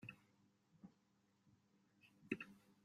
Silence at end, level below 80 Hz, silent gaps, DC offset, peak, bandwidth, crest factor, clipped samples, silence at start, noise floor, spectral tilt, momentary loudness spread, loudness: 0.1 s; under -90 dBFS; none; under 0.1%; -26 dBFS; 15 kHz; 32 dB; under 0.1%; 0 s; -80 dBFS; -6 dB/octave; 17 LU; -52 LUFS